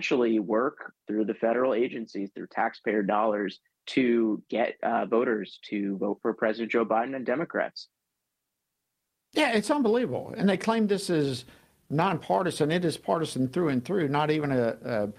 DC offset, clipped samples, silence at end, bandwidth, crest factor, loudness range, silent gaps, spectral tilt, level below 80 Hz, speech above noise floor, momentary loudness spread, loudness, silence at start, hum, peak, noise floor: under 0.1%; under 0.1%; 0.05 s; 14 kHz; 18 dB; 3 LU; none; -6 dB/octave; -68 dBFS; 56 dB; 8 LU; -27 LUFS; 0 s; none; -10 dBFS; -83 dBFS